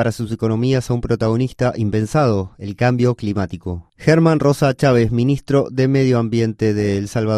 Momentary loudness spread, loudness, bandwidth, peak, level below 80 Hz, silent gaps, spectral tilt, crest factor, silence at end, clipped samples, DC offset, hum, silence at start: 7 LU; -17 LUFS; 13.5 kHz; 0 dBFS; -42 dBFS; none; -7.5 dB/octave; 16 dB; 0 s; under 0.1%; under 0.1%; none; 0 s